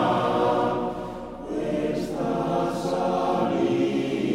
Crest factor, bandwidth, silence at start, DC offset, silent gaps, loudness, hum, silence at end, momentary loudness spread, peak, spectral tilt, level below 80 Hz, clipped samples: 14 dB; 15 kHz; 0 s; under 0.1%; none; -25 LUFS; none; 0 s; 9 LU; -10 dBFS; -6.5 dB/octave; -50 dBFS; under 0.1%